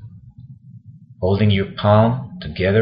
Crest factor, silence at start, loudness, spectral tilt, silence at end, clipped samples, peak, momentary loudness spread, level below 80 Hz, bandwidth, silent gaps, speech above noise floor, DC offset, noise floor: 18 dB; 0 s; -18 LUFS; -12 dB/octave; 0 s; under 0.1%; -2 dBFS; 11 LU; -44 dBFS; 5.2 kHz; none; 26 dB; under 0.1%; -42 dBFS